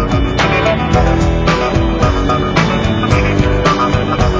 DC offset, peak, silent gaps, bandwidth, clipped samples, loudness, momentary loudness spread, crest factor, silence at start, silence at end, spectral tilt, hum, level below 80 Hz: under 0.1%; 0 dBFS; none; 8 kHz; under 0.1%; -13 LUFS; 2 LU; 12 dB; 0 s; 0 s; -6 dB/octave; none; -20 dBFS